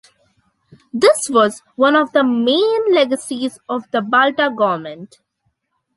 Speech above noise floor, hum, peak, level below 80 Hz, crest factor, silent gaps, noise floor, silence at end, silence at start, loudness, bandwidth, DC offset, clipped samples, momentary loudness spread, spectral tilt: 53 dB; none; -2 dBFS; -66 dBFS; 16 dB; none; -69 dBFS; 0.9 s; 0.95 s; -16 LUFS; 12 kHz; under 0.1%; under 0.1%; 11 LU; -3.5 dB/octave